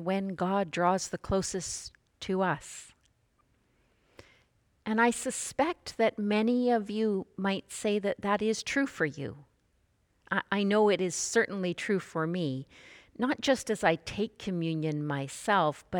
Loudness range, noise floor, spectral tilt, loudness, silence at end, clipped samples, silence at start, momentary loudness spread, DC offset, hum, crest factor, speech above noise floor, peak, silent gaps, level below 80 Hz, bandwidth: 5 LU; -71 dBFS; -4.5 dB/octave; -30 LUFS; 0 s; under 0.1%; 0 s; 9 LU; under 0.1%; none; 20 dB; 41 dB; -10 dBFS; none; -60 dBFS; 19 kHz